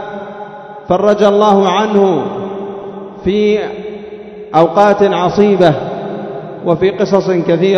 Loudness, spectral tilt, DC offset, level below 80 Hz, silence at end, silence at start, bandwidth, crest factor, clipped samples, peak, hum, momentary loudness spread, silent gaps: -12 LUFS; -7 dB/octave; under 0.1%; -46 dBFS; 0 s; 0 s; 7.2 kHz; 12 dB; 0.4%; 0 dBFS; none; 18 LU; none